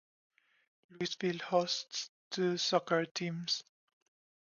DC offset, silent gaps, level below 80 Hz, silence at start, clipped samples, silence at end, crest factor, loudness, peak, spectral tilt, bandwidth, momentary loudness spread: under 0.1%; 2.09-2.31 s, 3.11-3.15 s; -84 dBFS; 0.9 s; under 0.1%; 0.9 s; 22 dB; -35 LUFS; -14 dBFS; -4 dB/octave; 7.2 kHz; 10 LU